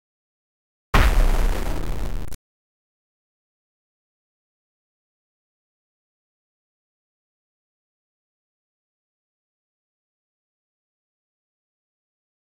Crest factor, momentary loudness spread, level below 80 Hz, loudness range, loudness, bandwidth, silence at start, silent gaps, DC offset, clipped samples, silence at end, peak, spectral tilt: 26 dB; 17 LU; -30 dBFS; 15 LU; -24 LUFS; 16.5 kHz; 0.95 s; none; 5%; under 0.1%; 10.25 s; -2 dBFS; -5 dB/octave